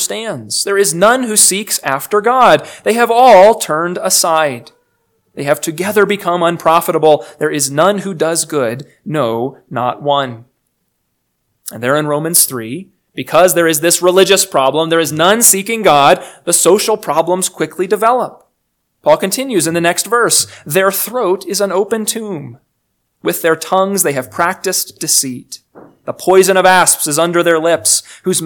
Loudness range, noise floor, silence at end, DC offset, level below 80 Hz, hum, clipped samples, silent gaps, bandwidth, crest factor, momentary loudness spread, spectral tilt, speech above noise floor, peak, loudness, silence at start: 6 LU; -67 dBFS; 0 s; under 0.1%; -58 dBFS; none; 0.7%; none; over 20 kHz; 14 dB; 12 LU; -2.5 dB/octave; 55 dB; 0 dBFS; -12 LUFS; 0 s